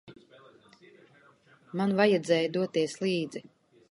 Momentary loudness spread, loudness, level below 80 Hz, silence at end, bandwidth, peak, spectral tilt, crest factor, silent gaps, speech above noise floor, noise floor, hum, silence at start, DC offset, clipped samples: 15 LU; -28 LUFS; -76 dBFS; 0.5 s; 11.5 kHz; -10 dBFS; -5.5 dB/octave; 20 dB; none; 33 dB; -60 dBFS; none; 0.05 s; under 0.1%; under 0.1%